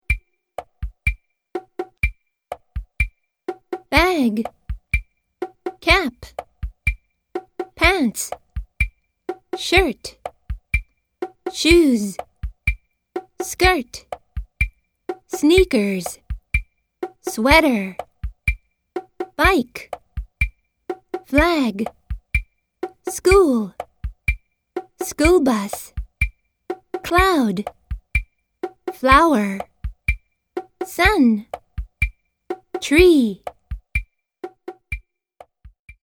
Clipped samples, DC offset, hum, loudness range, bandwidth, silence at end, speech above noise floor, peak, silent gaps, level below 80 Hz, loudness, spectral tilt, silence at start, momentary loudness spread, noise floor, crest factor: under 0.1%; under 0.1%; none; 5 LU; 19 kHz; 0.45 s; 33 dB; 0 dBFS; none; -32 dBFS; -20 LUFS; -5 dB/octave; 0.1 s; 20 LU; -50 dBFS; 22 dB